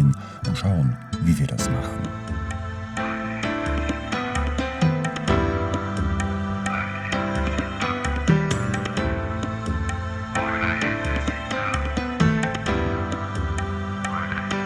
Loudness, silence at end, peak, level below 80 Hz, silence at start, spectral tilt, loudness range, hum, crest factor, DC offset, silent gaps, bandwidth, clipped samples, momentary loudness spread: -25 LUFS; 0 s; -4 dBFS; -34 dBFS; 0 s; -6 dB/octave; 2 LU; none; 20 dB; under 0.1%; none; 13.5 kHz; under 0.1%; 6 LU